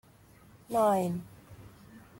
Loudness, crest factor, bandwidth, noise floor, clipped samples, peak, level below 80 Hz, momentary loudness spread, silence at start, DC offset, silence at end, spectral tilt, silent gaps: -30 LUFS; 18 dB; 16.5 kHz; -58 dBFS; under 0.1%; -16 dBFS; -64 dBFS; 26 LU; 0.7 s; under 0.1%; 0.2 s; -6.5 dB/octave; none